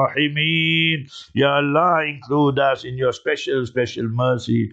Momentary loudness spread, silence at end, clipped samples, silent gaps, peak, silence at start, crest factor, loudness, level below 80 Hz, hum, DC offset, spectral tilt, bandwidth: 7 LU; 0 s; under 0.1%; none; -4 dBFS; 0 s; 16 dB; -19 LUFS; -58 dBFS; none; under 0.1%; -6 dB/octave; 8.2 kHz